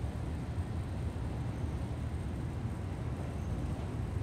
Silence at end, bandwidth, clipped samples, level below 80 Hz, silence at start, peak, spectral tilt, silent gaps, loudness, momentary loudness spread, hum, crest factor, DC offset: 0 s; 13 kHz; under 0.1%; -44 dBFS; 0 s; -24 dBFS; -7.5 dB/octave; none; -38 LUFS; 1 LU; none; 14 dB; under 0.1%